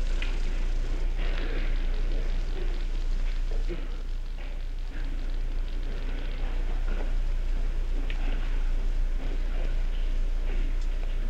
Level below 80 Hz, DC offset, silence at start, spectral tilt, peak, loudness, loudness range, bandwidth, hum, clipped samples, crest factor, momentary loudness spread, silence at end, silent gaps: -26 dBFS; under 0.1%; 0 s; -6 dB/octave; -16 dBFS; -35 LUFS; 3 LU; 7 kHz; none; under 0.1%; 10 dB; 4 LU; 0 s; none